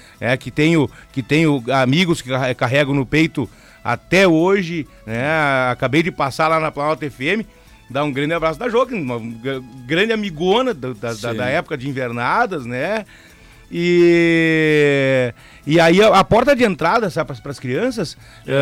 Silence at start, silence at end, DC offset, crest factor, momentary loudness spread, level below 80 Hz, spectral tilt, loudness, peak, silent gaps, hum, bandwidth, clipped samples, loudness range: 0.2 s; 0 s; under 0.1%; 12 dB; 13 LU; -46 dBFS; -6 dB/octave; -17 LUFS; -6 dBFS; none; none; 15.5 kHz; under 0.1%; 6 LU